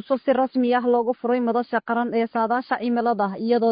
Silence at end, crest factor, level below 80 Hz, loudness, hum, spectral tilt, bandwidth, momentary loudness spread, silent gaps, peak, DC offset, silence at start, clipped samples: 0 s; 14 dB; -72 dBFS; -22 LUFS; none; -10.5 dB/octave; 5.2 kHz; 3 LU; none; -8 dBFS; under 0.1%; 0.1 s; under 0.1%